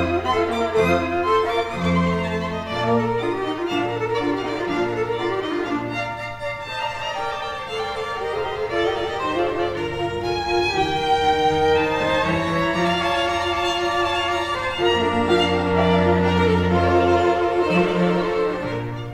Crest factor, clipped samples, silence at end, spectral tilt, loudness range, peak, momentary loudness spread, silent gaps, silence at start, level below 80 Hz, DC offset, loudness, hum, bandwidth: 16 dB; under 0.1%; 0 s; -6 dB/octave; 7 LU; -6 dBFS; 8 LU; none; 0 s; -44 dBFS; under 0.1%; -21 LUFS; none; 14.5 kHz